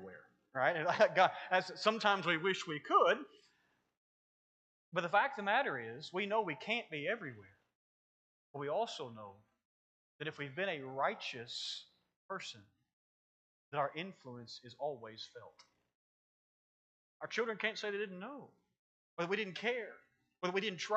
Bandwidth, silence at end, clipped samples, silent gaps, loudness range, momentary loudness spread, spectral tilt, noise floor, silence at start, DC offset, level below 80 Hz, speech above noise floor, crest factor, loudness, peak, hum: 8.8 kHz; 0 s; under 0.1%; 3.97-4.92 s, 7.75-8.54 s, 9.65-10.19 s, 12.16-12.29 s, 12.93-13.72 s, 15.95-17.20 s, 18.79-19.17 s; 12 LU; 18 LU; -4 dB/octave; -77 dBFS; 0 s; under 0.1%; under -90 dBFS; 40 dB; 24 dB; -36 LUFS; -16 dBFS; none